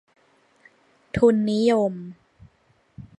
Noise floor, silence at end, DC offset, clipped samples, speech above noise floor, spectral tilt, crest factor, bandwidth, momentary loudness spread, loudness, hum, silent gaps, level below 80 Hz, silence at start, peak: -63 dBFS; 0.15 s; under 0.1%; under 0.1%; 43 dB; -7 dB/octave; 20 dB; 11 kHz; 18 LU; -21 LUFS; none; none; -52 dBFS; 1.15 s; -4 dBFS